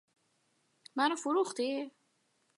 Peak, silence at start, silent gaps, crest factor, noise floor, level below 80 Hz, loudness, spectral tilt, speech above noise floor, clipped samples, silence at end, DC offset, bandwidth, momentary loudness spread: -16 dBFS; 0.95 s; none; 20 dB; -75 dBFS; under -90 dBFS; -33 LUFS; -2 dB/octave; 43 dB; under 0.1%; 0.7 s; under 0.1%; 11.5 kHz; 11 LU